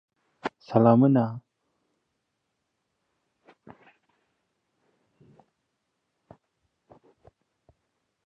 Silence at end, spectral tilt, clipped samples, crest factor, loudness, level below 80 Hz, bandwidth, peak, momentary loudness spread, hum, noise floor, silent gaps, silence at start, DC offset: 6.85 s; -10.5 dB/octave; under 0.1%; 24 dB; -23 LUFS; -72 dBFS; 5.8 kHz; -6 dBFS; 19 LU; none; -79 dBFS; none; 0.45 s; under 0.1%